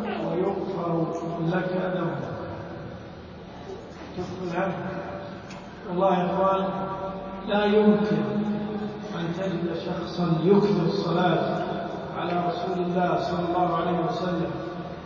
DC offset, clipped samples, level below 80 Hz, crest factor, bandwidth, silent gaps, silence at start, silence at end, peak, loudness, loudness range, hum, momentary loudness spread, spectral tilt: under 0.1%; under 0.1%; -52 dBFS; 18 dB; 7.2 kHz; none; 0 s; 0 s; -8 dBFS; -26 LUFS; 8 LU; none; 17 LU; -8 dB/octave